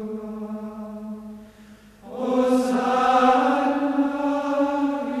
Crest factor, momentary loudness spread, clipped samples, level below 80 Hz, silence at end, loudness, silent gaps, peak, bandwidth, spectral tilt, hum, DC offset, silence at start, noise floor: 18 dB; 18 LU; under 0.1%; -58 dBFS; 0 s; -22 LUFS; none; -6 dBFS; 13 kHz; -5 dB/octave; 50 Hz at -60 dBFS; under 0.1%; 0 s; -48 dBFS